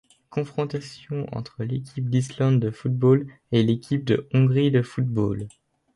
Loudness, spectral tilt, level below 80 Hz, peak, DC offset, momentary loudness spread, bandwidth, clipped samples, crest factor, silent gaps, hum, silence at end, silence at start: -24 LUFS; -8 dB/octave; -56 dBFS; -8 dBFS; under 0.1%; 12 LU; 11 kHz; under 0.1%; 16 dB; none; none; 0.45 s; 0.3 s